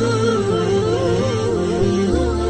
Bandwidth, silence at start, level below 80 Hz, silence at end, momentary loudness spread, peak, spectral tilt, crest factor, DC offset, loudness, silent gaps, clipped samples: 9.8 kHz; 0 s; -32 dBFS; 0 s; 2 LU; -6 dBFS; -6.5 dB/octave; 12 dB; under 0.1%; -18 LUFS; none; under 0.1%